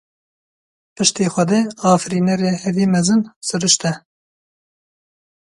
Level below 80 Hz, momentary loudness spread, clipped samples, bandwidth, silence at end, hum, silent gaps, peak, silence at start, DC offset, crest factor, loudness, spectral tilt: -60 dBFS; 4 LU; under 0.1%; 11.5 kHz; 1.45 s; none; 3.36-3.41 s; 0 dBFS; 1 s; under 0.1%; 20 dB; -17 LUFS; -4.5 dB/octave